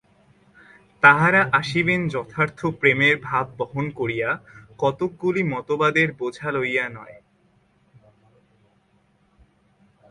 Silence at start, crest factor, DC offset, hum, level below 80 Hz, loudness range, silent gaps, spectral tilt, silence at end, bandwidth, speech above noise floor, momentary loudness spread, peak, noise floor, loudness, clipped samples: 1.05 s; 24 dB; under 0.1%; none; -58 dBFS; 11 LU; none; -6 dB/octave; 2.95 s; 11.5 kHz; 41 dB; 11 LU; 0 dBFS; -62 dBFS; -21 LUFS; under 0.1%